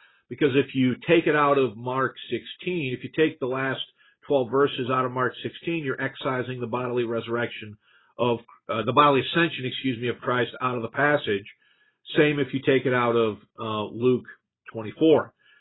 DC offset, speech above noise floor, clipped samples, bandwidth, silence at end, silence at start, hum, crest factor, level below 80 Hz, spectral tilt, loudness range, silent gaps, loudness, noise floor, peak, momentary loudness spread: under 0.1%; 31 dB; under 0.1%; 4.1 kHz; 0.35 s; 0.3 s; none; 22 dB; -66 dBFS; -10.5 dB/octave; 4 LU; none; -25 LUFS; -55 dBFS; -4 dBFS; 11 LU